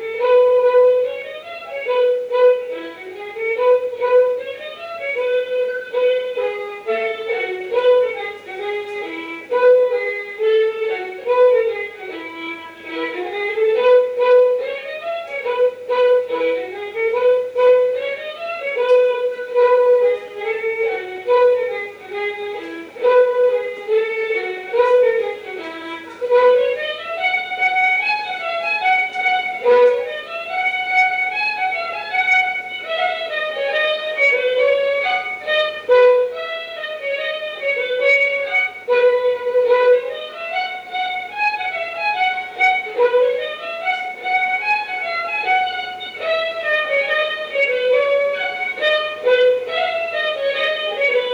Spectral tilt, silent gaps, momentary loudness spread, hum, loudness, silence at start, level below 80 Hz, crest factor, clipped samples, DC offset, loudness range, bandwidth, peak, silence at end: -2.5 dB/octave; none; 12 LU; none; -18 LUFS; 0 s; -68 dBFS; 14 dB; under 0.1%; under 0.1%; 3 LU; 7.2 kHz; -4 dBFS; 0 s